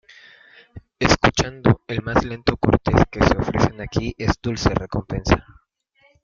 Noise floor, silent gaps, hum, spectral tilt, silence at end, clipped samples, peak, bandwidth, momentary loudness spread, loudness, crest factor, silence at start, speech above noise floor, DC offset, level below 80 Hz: -61 dBFS; none; none; -5.5 dB/octave; 0.8 s; under 0.1%; -2 dBFS; 7.6 kHz; 7 LU; -20 LUFS; 20 dB; 0.75 s; 41 dB; under 0.1%; -34 dBFS